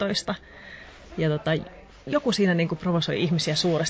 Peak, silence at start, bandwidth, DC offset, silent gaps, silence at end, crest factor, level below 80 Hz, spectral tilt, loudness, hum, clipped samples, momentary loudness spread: -12 dBFS; 0 s; 8 kHz; under 0.1%; none; 0 s; 14 dB; -52 dBFS; -5 dB/octave; -25 LUFS; none; under 0.1%; 20 LU